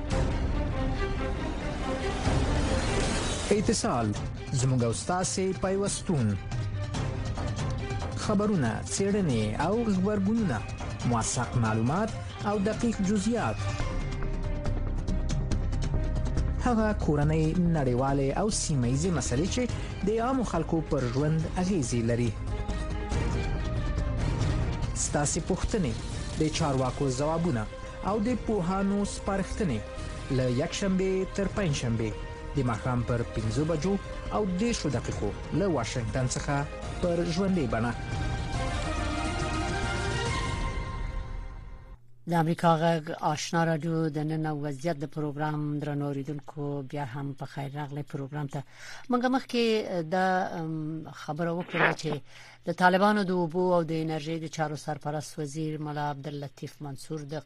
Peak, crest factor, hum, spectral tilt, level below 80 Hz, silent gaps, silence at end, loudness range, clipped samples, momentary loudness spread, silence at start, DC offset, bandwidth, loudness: -8 dBFS; 20 dB; none; -5.5 dB/octave; -38 dBFS; none; 0 s; 4 LU; under 0.1%; 9 LU; 0 s; under 0.1%; 12.5 kHz; -29 LUFS